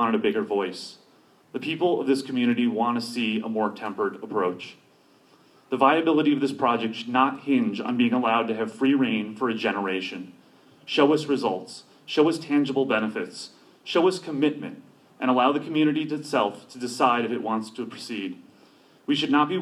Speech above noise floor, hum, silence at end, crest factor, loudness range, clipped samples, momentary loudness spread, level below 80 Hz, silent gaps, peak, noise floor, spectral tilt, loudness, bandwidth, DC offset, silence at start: 34 dB; none; 0 s; 20 dB; 3 LU; under 0.1%; 14 LU; -78 dBFS; none; -4 dBFS; -58 dBFS; -5.5 dB/octave; -25 LUFS; 13 kHz; under 0.1%; 0 s